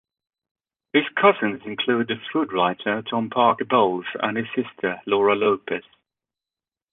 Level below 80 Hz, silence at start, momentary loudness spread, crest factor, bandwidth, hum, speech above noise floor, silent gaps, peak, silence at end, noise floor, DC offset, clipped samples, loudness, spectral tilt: -66 dBFS; 0.95 s; 8 LU; 20 dB; 4 kHz; none; over 68 dB; none; -2 dBFS; 1.1 s; under -90 dBFS; under 0.1%; under 0.1%; -22 LUFS; -8.5 dB/octave